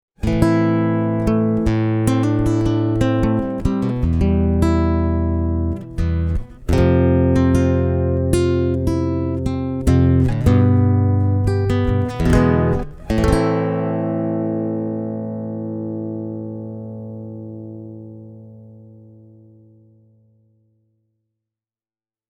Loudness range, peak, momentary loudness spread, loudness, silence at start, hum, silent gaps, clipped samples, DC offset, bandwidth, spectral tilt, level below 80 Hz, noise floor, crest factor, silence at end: 14 LU; 0 dBFS; 14 LU; -18 LUFS; 0.2 s; none; none; under 0.1%; under 0.1%; 12 kHz; -8.5 dB/octave; -28 dBFS; under -90 dBFS; 18 dB; 3.4 s